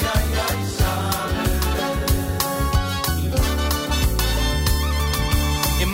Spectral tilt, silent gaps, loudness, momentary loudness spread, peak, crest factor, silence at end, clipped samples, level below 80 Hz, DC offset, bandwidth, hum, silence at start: -4.5 dB/octave; none; -21 LUFS; 2 LU; -4 dBFS; 16 dB; 0 s; under 0.1%; -24 dBFS; under 0.1%; 16.5 kHz; none; 0 s